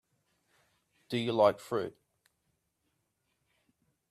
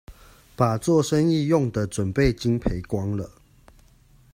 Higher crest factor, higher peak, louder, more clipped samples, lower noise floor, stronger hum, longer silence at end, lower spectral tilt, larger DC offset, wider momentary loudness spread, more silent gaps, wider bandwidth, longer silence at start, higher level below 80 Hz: first, 24 dB vs 18 dB; second, -12 dBFS vs -6 dBFS; second, -31 LUFS vs -23 LUFS; neither; first, -80 dBFS vs -55 dBFS; neither; first, 2.2 s vs 1.05 s; about the same, -6 dB/octave vs -6.5 dB/octave; neither; first, 11 LU vs 8 LU; neither; second, 14.5 kHz vs 16 kHz; first, 1.1 s vs 0.1 s; second, -78 dBFS vs -40 dBFS